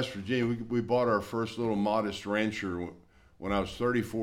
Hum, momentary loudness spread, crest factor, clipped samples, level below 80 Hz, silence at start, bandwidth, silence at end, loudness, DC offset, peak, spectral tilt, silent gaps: none; 8 LU; 16 dB; under 0.1%; -54 dBFS; 0 s; 16 kHz; 0 s; -31 LUFS; under 0.1%; -14 dBFS; -6 dB/octave; none